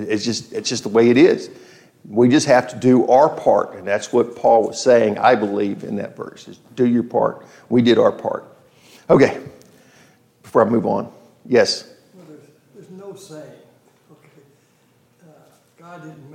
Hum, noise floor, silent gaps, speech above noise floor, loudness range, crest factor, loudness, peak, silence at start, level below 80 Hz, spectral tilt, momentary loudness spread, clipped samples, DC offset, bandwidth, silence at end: none; -58 dBFS; none; 41 dB; 6 LU; 18 dB; -17 LUFS; 0 dBFS; 0 s; -62 dBFS; -5.5 dB/octave; 22 LU; under 0.1%; under 0.1%; 11.5 kHz; 0.25 s